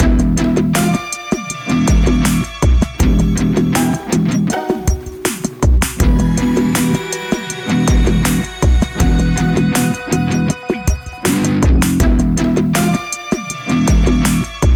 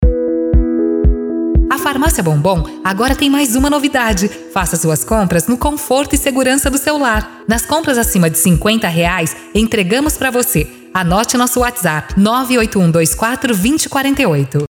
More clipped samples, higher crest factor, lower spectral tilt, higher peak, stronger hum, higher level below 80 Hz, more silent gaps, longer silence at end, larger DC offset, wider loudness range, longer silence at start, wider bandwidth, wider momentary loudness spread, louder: neither; about the same, 10 dB vs 12 dB; about the same, -5.5 dB/octave vs -4.5 dB/octave; second, -4 dBFS vs 0 dBFS; neither; about the same, -18 dBFS vs -22 dBFS; neither; about the same, 0 s vs 0.05 s; neither; about the same, 1 LU vs 1 LU; about the same, 0 s vs 0 s; about the same, 18.5 kHz vs 19.5 kHz; about the same, 7 LU vs 5 LU; about the same, -15 LUFS vs -13 LUFS